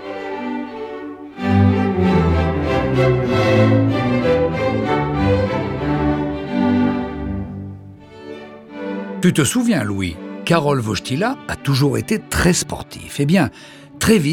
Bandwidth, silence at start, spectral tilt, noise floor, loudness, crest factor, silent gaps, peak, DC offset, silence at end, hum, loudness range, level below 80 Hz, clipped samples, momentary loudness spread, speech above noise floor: 17.5 kHz; 0 s; -6 dB/octave; -38 dBFS; -18 LUFS; 18 dB; none; 0 dBFS; under 0.1%; 0 s; none; 5 LU; -36 dBFS; under 0.1%; 14 LU; 20 dB